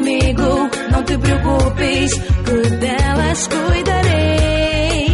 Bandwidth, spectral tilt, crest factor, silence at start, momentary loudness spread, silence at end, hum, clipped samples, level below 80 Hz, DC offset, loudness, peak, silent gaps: 11.5 kHz; -5 dB/octave; 10 dB; 0 s; 3 LU; 0 s; none; under 0.1%; -22 dBFS; under 0.1%; -16 LUFS; -4 dBFS; none